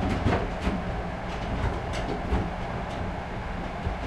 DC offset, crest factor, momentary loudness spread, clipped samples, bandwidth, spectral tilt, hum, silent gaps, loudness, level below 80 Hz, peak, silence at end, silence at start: under 0.1%; 18 dB; 7 LU; under 0.1%; 11 kHz; -7 dB/octave; none; none; -31 LUFS; -34 dBFS; -12 dBFS; 0 s; 0 s